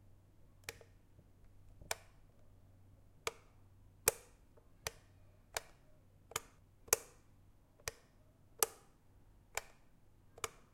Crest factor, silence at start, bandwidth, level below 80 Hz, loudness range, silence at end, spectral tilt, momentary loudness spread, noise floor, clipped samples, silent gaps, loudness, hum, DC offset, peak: 38 dB; 0.4 s; 16 kHz; -66 dBFS; 9 LU; 0.2 s; -0.5 dB/octave; 27 LU; -66 dBFS; under 0.1%; none; -42 LUFS; none; under 0.1%; -10 dBFS